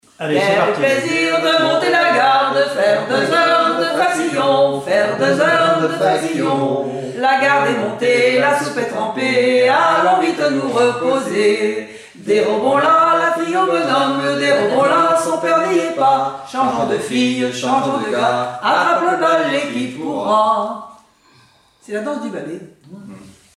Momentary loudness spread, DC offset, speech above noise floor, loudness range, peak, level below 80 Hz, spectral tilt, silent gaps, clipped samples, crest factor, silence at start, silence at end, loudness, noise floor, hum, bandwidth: 8 LU; under 0.1%; 36 dB; 3 LU; -2 dBFS; -62 dBFS; -4.5 dB/octave; none; under 0.1%; 14 dB; 0.2 s; 0.3 s; -15 LUFS; -52 dBFS; none; 13.5 kHz